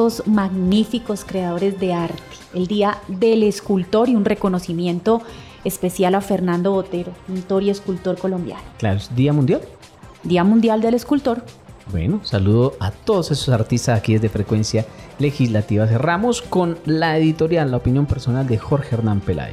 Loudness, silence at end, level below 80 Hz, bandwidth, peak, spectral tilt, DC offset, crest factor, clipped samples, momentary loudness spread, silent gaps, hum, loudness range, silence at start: -19 LUFS; 0 s; -42 dBFS; 15 kHz; -6 dBFS; -7 dB/octave; under 0.1%; 12 dB; under 0.1%; 8 LU; none; none; 3 LU; 0 s